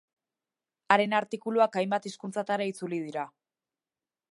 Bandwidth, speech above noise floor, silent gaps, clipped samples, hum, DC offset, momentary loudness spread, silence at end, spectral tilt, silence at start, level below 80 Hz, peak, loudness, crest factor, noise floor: 11.5 kHz; over 61 dB; none; under 0.1%; none; under 0.1%; 12 LU; 1.05 s; -5 dB/octave; 0.9 s; -86 dBFS; -4 dBFS; -29 LUFS; 26 dB; under -90 dBFS